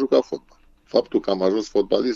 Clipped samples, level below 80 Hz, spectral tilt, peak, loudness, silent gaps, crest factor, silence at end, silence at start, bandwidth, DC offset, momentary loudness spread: under 0.1%; -54 dBFS; -6 dB/octave; -2 dBFS; -22 LUFS; none; 20 dB; 0 s; 0 s; 7.6 kHz; under 0.1%; 7 LU